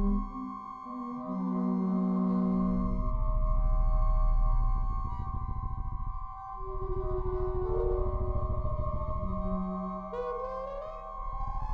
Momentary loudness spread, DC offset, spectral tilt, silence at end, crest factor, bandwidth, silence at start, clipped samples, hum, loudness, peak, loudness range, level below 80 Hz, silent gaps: 11 LU; under 0.1%; -11.5 dB/octave; 0 s; 12 dB; 2.5 kHz; 0 s; under 0.1%; none; -34 LUFS; -18 dBFS; 5 LU; -32 dBFS; none